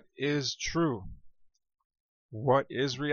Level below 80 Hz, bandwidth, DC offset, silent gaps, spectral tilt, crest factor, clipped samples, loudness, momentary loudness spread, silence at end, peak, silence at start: -54 dBFS; 7.2 kHz; under 0.1%; 1.85-1.90 s, 2.00-2.29 s; -5 dB/octave; 20 dB; under 0.1%; -30 LUFS; 14 LU; 0 s; -14 dBFS; 0.2 s